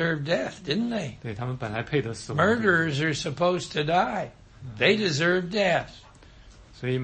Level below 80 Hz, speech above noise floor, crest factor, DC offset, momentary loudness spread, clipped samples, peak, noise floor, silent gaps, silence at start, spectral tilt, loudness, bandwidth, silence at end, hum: -54 dBFS; 24 dB; 18 dB; under 0.1%; 12 LU; under 0.1%; -8 dBFS; -50 dBFS; none; 0 s; -5 dB/octave; -25 LUFS; 8.8 kHz; 0 s; none